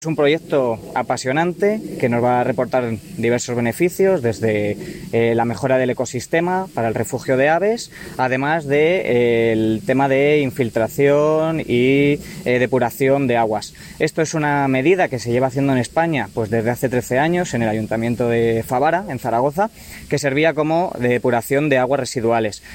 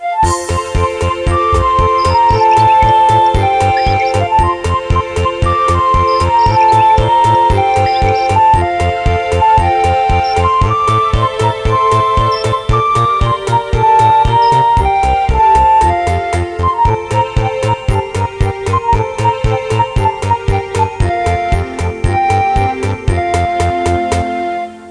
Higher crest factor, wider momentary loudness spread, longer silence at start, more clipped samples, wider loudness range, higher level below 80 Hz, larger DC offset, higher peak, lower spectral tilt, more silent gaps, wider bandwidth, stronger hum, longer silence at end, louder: first, 16 dB vs 10 dB; about the same, 6 LU vs 7 LU; about the same, 0 s vs 0 s; neither; about the same, 3 LU vs 4 LU; second, -50 dBFS vs -22 dBFS; neither; about the same, -2 dBFS vs 0 dBFS; about the same, -6 dB/octave vs -6 dB/octave; neither; first, 17 kHz vs 10.5 kHz; neither; about the same, 0 s vs 0 s; second, -18 LUFS vs -12 LUFS